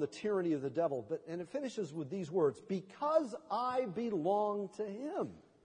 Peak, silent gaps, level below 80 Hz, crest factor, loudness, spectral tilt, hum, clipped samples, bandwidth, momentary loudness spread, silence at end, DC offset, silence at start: -18 dBFS; none; -82 dBFS; 18 dB; -37 LUFS; -7 dB/octave; none; under 0.1%; 10 kHz; 8 LU; 0.25 s; under 0.1%; 0 s